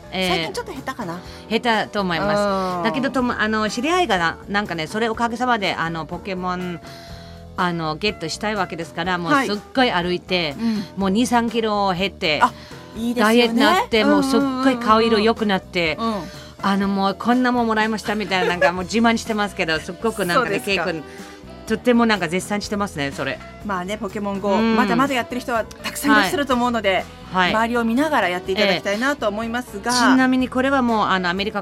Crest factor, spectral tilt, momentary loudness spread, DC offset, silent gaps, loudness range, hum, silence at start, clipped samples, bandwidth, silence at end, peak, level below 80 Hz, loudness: 20 dB; -4.5 dB/octave; 10 LU; under 0.1%; none; 5 LU; none; 0 s; under 0.1%; 16 kHz; 0 s; -2 dBFS; -46 dBFS; -20 LUFS